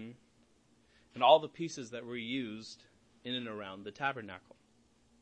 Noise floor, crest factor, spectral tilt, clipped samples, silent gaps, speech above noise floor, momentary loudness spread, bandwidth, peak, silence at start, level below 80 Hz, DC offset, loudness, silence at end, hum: -69 dBFS; 24 dB; -4.5 dB/octave; under 0.1%; none; 35 dB; 25 LU; 8.8 kHz; -12 dBFS; 0 s; -78 dBFS; under 0.1%; -34 LUFS; 0.8 s; none